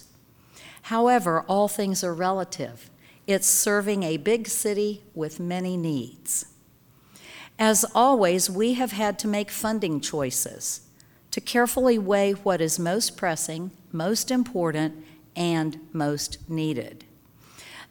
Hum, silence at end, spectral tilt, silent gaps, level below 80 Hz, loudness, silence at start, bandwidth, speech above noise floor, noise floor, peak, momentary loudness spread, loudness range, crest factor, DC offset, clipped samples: none; 0.05 s; -3.5 dB/octave; none; -60 dBFS; -24 LUFS; 0.55 s; over 20 kHz; 33 dB; -57 dBFS; -6 dBFS; 14 LU; 4 LU; 20 dB; under 0.1%; under 0.1%